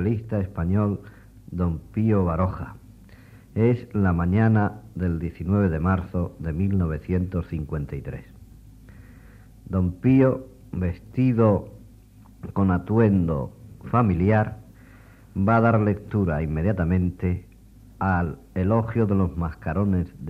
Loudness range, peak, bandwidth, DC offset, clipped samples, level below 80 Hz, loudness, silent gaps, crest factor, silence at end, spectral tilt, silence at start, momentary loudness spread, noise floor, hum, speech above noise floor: 4 LU; -6 dBFS; 4.9 kHz; under 0.1%; under 0.1%; -42 dBFS; -24 LUFS; none; 18 dB; 0 s; -10.5 dB/octave; 0 s; 13 LU; -49 dBFS; none; 26 dB